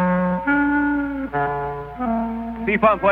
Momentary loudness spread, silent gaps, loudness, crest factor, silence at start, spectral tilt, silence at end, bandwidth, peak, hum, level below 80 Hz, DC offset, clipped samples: 9 LU; none; -21 LUFS; 16 dB; 0 s; -9.5 dB/octave; 0 s; 4.4 kHz; -4 dBFS; none; -42 dBFS; under 0.1%; under 0.1%